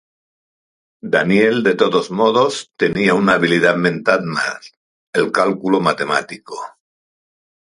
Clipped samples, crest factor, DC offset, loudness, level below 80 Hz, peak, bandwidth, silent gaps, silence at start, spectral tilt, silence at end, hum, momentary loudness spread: under 0.1%; 18 dB; under 0.1%; -16 LUFS; -58 dBFS; 0 dBFS; 11.5 kHz; 4.77-5.13 s; 1.05 s; -5 dB/octave; 1.05 s; none; 16 LU